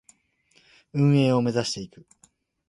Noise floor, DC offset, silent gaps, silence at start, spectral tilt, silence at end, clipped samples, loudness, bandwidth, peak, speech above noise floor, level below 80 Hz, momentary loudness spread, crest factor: -64 dBFS; under 0.1%; none; 0.95 s; -6.5 dB/octave; 0.85 s; under 0.1%; -23 LUFS; 11.5 kHz; -10 dBFS; 41 dB; -64 dBFS; 14 LU; 16 dB